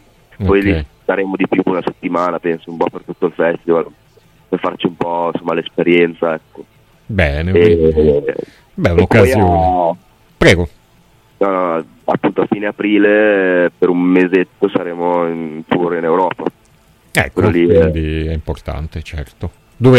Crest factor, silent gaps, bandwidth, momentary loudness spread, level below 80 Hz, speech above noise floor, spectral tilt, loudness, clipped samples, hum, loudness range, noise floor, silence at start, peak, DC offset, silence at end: 14 dB; none; 14.5 kHz; 13 LU; -32 dBFS; 36 dB; -7 dB/octave; -15 LUFS; under 0.1%; none; 5 LU; -50 dBFS; 0.4 s; 0 dBFS; under 0.1%; 0 s